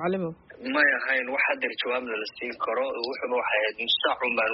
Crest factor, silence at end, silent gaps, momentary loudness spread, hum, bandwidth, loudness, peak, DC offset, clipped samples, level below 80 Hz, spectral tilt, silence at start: 18 dB; 0 s; none; 10 LU; none; 5.8 kHz; -26 LUFS; -10 dBFS; under 0.1%; under 0.1%; -68 dBFS; -0.5 dB/octave; 0 s